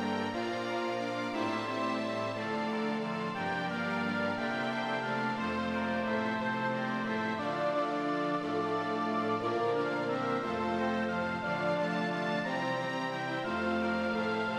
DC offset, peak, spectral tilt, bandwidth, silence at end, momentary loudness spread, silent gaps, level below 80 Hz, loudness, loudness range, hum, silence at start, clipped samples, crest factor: under 0.1%; -20 dBFS; -6 dB/octave; 11.5 kHz; 0 s; 3 LU; none; -68 dBFS; -33 LUFS; 2 LU; none; 0 s; under 0.1%; 14 dB